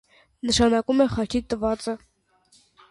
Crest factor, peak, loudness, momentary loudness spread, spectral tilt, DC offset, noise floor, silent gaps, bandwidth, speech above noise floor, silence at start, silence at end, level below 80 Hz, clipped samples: 16 dB; -8 dBFS; -23 LUFS; 13 LU; -4.5 dB/octave; under 0.1%; -61 dBFS; none; 11.5 kHz; 39 dB; 0.45 s; 0.95 s; -44 dBFS; under 0.1%